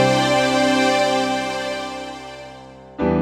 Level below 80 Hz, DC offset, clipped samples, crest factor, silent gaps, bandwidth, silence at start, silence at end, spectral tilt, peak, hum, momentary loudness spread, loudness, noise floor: -46 dBFS; under 0.1%; under 0.1%; 18 dB; none; 15.5 kHz; 0 s; 0 s; -4.5 dB/octave; -2 dBFS; none; 20 LU; -19 LUFS; -40 dBFS